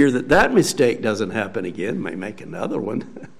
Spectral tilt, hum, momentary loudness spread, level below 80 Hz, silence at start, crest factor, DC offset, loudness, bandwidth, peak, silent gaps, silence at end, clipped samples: -5 dB/octave; none; 14 LU; -44 dBFS; 0 s; 18 dB; 0.8%; -21 LUFS; 15.5 kHz; -4 dBFS; none; 0.15 s; under 0.1%